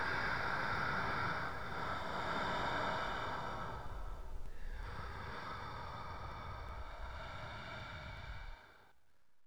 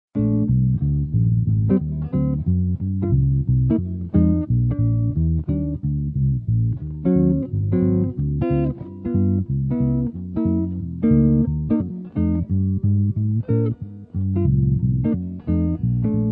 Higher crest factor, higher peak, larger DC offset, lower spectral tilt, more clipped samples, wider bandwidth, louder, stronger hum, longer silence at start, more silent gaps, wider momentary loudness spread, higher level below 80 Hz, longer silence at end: about the same, 16 dB vs 14 dB; second, -26 dBFS vs -6 dBFS; first, 0.3% vs under 0.1%; second, -5 dB/octave vs -14.5 dB/octave; neither; first, over 20 kHz vs 2.9 kHz; second, -42 LUFS vs -21 LUFS; neither; second, 0 s vs 0.15 s; neither; first, 13 LU vs 6 LU; second, -52 dBFS vs -32 dBFS; about the same, 0 s vs 0 s